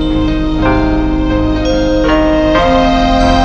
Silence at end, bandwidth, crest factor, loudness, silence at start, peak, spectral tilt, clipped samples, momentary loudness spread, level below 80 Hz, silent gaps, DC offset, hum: 0 s; 8 kHz; 10 dB; -12 LUFS; 0 s; 0 dBFS; -6.5 dB/octave; under 0.1%; 4 LU; -18 dBFS; none; under 0.1%; none